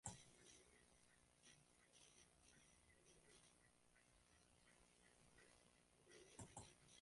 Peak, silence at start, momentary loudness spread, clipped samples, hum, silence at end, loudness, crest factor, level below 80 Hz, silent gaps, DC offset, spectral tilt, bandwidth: -36 dBFS; 0.05 s; 9 LU; under 0.1%; 60 Hz at -85 dBFS; 0 s; -64 LUFS; 32 dB; -82 dBFS; none; under 0.1%; -3 dB/octave; 11.5 kHz